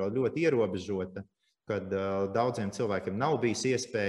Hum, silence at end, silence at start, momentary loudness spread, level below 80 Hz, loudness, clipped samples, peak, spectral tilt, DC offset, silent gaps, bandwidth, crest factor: none; 0 s; 0 s; 8 LU; -68 dBFS; -31 LUFS; under 0.1%; -12 dBFS; -5.5 dB/octave; under 0.1%; none; 12 kHz; 18 dB